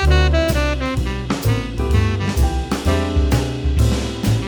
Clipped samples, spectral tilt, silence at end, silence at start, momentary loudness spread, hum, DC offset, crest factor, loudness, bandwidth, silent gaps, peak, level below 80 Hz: under 0.1%; -6 dB/octave; 0 s; 0 s; 5 LU; none; under 0.1%; 14 dB; -19 LUFS; over 20 kHz; none; -4 dBFS; -20 dBFS